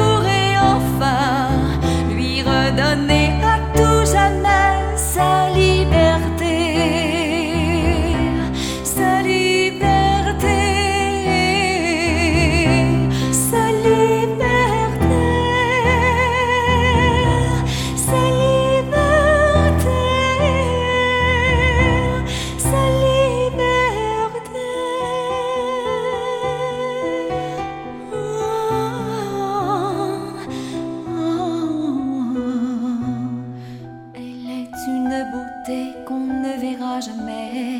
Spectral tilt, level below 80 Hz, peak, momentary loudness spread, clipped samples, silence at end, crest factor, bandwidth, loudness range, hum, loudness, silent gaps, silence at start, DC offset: -5 dB/octave; -28 dBFS; -2 dBFS; 11 LU; under 0.1%; 0 s; 16 dB; 17.5 kHz; 8 LU; none; -18 LUFS; none; 0 s; under 0.1%